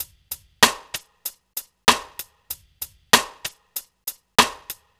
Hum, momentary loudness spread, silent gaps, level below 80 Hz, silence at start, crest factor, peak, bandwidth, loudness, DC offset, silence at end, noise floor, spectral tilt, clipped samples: none; 17 LU; none; -52 dBFS; 0 s; 24 dB; 0 dBFS; over 20 kHz; -20 LUFS; under 0.1%; 0.25 s; -40 dBFS; -0.5 dB/octave; under 0.1%